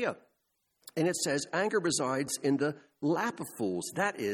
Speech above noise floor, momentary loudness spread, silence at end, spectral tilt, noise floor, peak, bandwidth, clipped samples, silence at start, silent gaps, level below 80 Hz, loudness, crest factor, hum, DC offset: 47 dB; 7 LU; 0 s; -4 dB/octave; -79 dBFS; -14 dBFS; 19 kHz; under 0.1%; 0 s; none; -74 dBFS; -32 LUFS; 18 dB; none; under 0.1%